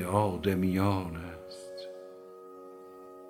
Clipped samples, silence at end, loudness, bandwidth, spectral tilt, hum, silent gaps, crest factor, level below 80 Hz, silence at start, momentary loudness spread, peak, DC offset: under 0.1%; 0 s; -31 LUFS; 16.5 kHz; -7 dB/octave; none; none; 22 dB; -58 dBFS; 0 s; 21 LU; -10 dBFS; under 0.1%